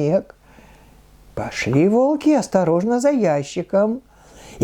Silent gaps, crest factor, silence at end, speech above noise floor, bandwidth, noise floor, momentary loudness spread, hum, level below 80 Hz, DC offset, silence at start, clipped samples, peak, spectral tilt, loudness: none; 18 dB; 0 s; 30 dB; 14 kHz; -48 dBFS; 11 LU; none; -52 dBFS; under 0.1%; 0 s; under 0.1%; -2 dBFS; -6.5 dB/octave; -18 LUFS